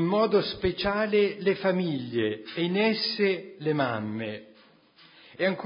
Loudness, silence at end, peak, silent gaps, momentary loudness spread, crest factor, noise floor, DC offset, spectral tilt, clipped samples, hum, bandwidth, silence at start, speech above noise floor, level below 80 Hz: -27 LUFS; 0 s; -12 dBFS; none; 7 LU; 16 dB; -57 dBFS; under 0.1%; -10 dB/octave; under 0.1%; none; 5.4 kHz; 0 s; 31 dB; -56 dBFS